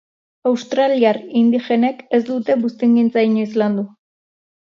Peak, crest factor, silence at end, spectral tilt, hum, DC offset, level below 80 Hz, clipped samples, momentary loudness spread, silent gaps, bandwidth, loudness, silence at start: -2 dBFS; 16 dB; 0.8 s; -7 dB/octave; none; under 0.1%; -70 dBFS; under 0.1%; 6 LU; none; 7 kHz; -17 LUFS; 0.45 s